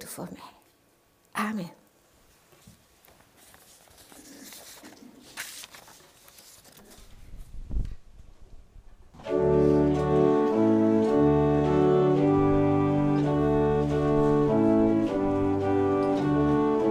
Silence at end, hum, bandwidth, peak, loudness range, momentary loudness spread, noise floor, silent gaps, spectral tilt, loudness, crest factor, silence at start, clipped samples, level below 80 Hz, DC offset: 0 s; none; 15.5 kHz; -10 dBFS; 22 LU; 21 LU; -64 dBFS; none; -8 dB/octave; -24 LUFS; 16 dB; 0 s; under 0.1%; -42 dBFS; under 0.1%